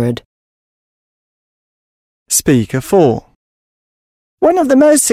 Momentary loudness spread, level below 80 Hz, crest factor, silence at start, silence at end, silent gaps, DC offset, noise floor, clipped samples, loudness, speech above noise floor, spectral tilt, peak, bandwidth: 11 LU; -46 dBFS; 14 dB; 0 s; 0 s; 0.25-2.26 s, 3.35-4.38 s; under 0.1%; under -90 dBFS; under 0.1%; -12 LUFS; over 79 dB; -5 dB/octave; 0 dBFS; 16 kHz